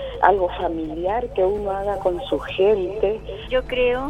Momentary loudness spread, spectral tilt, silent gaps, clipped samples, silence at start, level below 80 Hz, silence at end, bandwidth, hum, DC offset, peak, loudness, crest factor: 7 LU; -6.5 dB/octave; none; under 0.1%; 0 s; -38 dBFS; 0 s; 11 kHz; none; under 0.1%; 0 dBFS; -22 LUFS; 22 dB